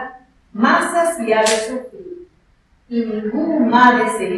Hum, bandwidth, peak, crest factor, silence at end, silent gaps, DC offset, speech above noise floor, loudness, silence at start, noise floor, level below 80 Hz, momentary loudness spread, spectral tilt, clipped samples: none; 12.5 kHz; 0 dBFS; 18 dB; 0 s; none; under 0.1%; 40 dB; -16 LUFS; 0 s; -56 dBFS; -56 dBFS; 22 LU; -3.5 dB/octave; under 0.1%